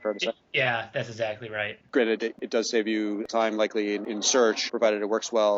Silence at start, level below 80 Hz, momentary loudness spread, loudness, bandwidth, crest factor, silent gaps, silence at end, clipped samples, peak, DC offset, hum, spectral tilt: 0 s; -74 dBFS; 8 LU; -26 LUFS; 8 kHz; 16 dB; none; 0 s; under 0.1%; -10 dBFS; under 0.1%; none; -2 dB/octave